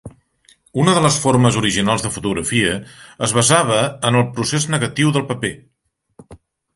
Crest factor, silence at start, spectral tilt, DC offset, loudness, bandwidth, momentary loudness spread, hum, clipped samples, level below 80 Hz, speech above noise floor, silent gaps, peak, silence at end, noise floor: 18 dB; 0.05 s; -4 dB/octave; under 0.1%; -17 LUFS; 11.5 kHz; 9 LU; none; under 0.1%; -46 dBFS; 38 dB; none; 0 dBFS; 0.4 s; -55 dBFS